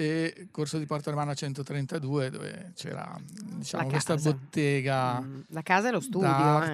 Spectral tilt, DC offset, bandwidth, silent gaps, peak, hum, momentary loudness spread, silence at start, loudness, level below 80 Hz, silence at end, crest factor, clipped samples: -6 dB/octave; under 0.1%; 13.5 kHz; none; -8 dBFS; none; 14 LU; 0 s; -29 LUFS; -70 dBFS; 0 s; 22 dB; under 0.1%